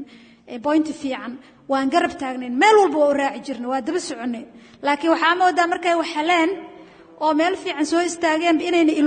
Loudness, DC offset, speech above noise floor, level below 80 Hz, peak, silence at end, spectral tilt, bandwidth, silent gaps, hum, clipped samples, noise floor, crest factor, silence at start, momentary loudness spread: -20 LUFS; under 0.1%; 24 dB; -64 dBFS; -4 dBFS; 0 s; -3 dB/octave; 9.4 kHz; none; none; under 0.1%; -44 dBFS; 16 dB; 0 s; 12 LU